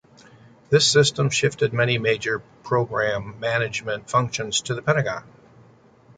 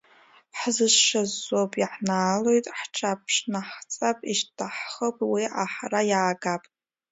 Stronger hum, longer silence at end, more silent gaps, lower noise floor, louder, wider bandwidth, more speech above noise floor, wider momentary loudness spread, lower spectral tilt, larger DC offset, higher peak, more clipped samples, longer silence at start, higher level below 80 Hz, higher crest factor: neither; first, 0.95 s vs 0.5 s; neither; second, -52 dBFS vs -57 dBFS; first, -22 LUFS vs -25 LUFS; first, 9.6 kHz vs 8 kHz; about the same, 30 dB vs 31 dB; about the same, 10 LU vs 12 LU; about the same, -3.5 dB/octave vs -2.5 dB/octave; neither; about the same, -4 dBFS vs -6 dBFS; neither; first, 0.7 s vs 0.55 s; first, -56 dBFS vs -74 dBFS; about the same, 20 dB vs 20 dB